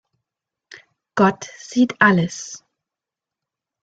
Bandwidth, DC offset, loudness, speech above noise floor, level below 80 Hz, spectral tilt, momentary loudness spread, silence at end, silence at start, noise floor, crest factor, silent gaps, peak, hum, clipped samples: 8 kHz; under 0.1%; -18 LUFS; 69 dB; -62 dBFS; -5.5 dB/octave; 19 LU; 1.25 s; 1.15 s; -87 dBFS; 20 dB; none; -2 dBFS; none; under 0.1%